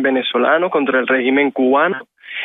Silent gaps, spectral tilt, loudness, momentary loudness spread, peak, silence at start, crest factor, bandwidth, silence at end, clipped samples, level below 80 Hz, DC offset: none; -7.5 dB/octave; -15 LUFS; 5 LU; -4 dBFS; 0 s; 12 dB; 3.9 kHz; 0 s; under 0.1%; -68 dBFS; under 0.1%